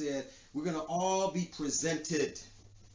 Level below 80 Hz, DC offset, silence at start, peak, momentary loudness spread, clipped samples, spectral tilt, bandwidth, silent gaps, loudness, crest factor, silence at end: -64 dBFS; under 0.1%; 0 s; -20 dBFS; 11 LU; under 0.1%; -4 dB/octave; 7.8 kHz; none; -34 LUFS; 16 dB; 0 s